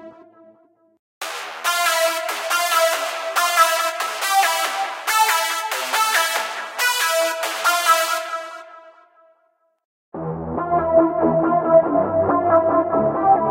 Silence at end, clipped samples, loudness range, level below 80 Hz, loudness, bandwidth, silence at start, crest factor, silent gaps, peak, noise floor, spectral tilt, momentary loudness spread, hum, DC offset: 0 s; under 0.1%; 5 LU; -54 dBFS; -19 LUFS; 16 kHz; 0 s; 18 dB; 0.99-1.21 s, 9.85-10.12 s; -2 dBFS; -65 dBFS; -2.5 dB/octave; 13 LU; none; under 0.1%